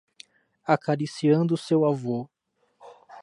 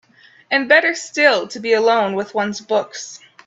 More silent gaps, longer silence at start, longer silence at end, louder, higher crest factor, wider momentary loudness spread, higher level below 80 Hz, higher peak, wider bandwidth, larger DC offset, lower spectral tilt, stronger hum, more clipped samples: neither; first, 0.65 s vs 0.5 s; second, 0 s vs 0.3 s; second, -25 LUFS vs -17 LUFS; about the same, 20 dB vs 18 dB; about the same, 11 LU vs 11 LU; second, -76 dBFS vs -68 dBFS; second, -6 dBFS vs 0 dBFS; first, 11 kHz vs 8.2 kHz; neither; first, -7.5 dB/octave vs -3 dB/octave; neither; neither